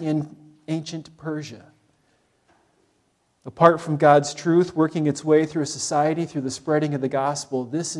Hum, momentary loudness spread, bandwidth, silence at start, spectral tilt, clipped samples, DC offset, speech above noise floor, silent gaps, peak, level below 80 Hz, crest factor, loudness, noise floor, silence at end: none; 16 LU; 12 kHz; 0 s; -5.5 dB/octave; under 0.1%; under 0.1%; 45 dB; none; 0 dBFS; -68 dBFS; 22 dB; -22 LUFS; -67 dBFS; 0 s